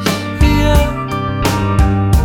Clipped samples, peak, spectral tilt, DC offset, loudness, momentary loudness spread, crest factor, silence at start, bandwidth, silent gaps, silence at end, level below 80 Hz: under 0.1%; 0 dBFS; -6 dB/octave; under 0.1%; -14 LUFS; 6 LU; 12 dB; 0 s; 18 kHz; none; 0 s; -16 dBFS